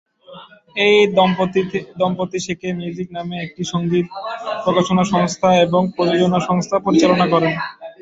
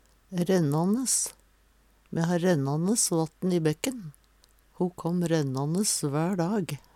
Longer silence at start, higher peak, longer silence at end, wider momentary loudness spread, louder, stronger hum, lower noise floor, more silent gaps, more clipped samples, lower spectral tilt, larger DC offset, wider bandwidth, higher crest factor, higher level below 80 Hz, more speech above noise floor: about the same, 0.3 s vs 0.3 s; first, -2 dBFS vs -10 dBFS; about the same, 0.1 s vs 0.15 s; first, 12 LU vs 8 LU; first, -17 LUFS vs -27 LUFS; neither; second, -41 dBFS vs -62 dBFS; neither; neither; about the same, -5.5 dB/octave vs -5 dB/octave; neither; second, 8 kHz vs 16.5 kHz; about the same, 16 dB vs 18 dB; first, -54 dBFS vs -62 dBFS; second, 24 dB vs 36 dB